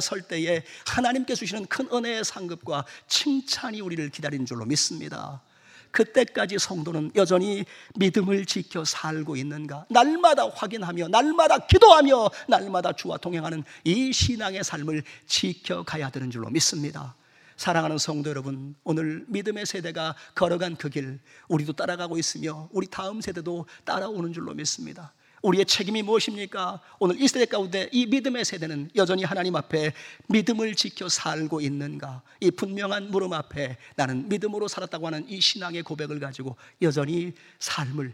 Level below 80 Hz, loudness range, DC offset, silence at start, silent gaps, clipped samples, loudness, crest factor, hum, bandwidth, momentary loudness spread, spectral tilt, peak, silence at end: -50 dBFS; 9 LU; under 0.1%; 0 s; none; under 0.1%; -25 LUFS; 26 dB; none; 16 kHz; 12 LU; -4 dB/octave; 0 dBFS; 0 s